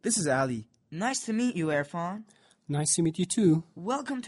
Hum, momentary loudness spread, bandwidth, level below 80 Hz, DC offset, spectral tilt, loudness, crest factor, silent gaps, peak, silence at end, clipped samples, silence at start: none; 10 LU; 11.5 kHz; -66 dBFS; under 0.1%; -4.5 dB/octave; -28 LUFS; 16 dB; none; -12 dBFS; 0 s; under 0.1%; 0.05 s